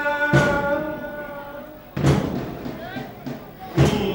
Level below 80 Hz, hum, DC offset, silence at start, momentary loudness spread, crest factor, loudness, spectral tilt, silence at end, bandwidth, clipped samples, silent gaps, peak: -40 dBFS; none; under 0.1%; 0 s; 16 LU; 20 dB; -23 LUFS; -6.5 dB/octave; 0 s; 17 kHz; under 0.1%; none; -4 dBFS